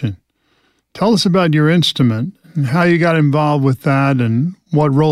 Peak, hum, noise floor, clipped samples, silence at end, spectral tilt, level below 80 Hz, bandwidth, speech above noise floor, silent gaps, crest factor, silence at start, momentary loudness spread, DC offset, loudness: -4 dBFS; none; -60 dBFS; under 0.1%; 0 s; -6.5 dB/octave; -52 dBFS; 14 kHz; 47 dB; none; 12 dB; 0 s; 7 LU; under 0.1%; -14 LUFS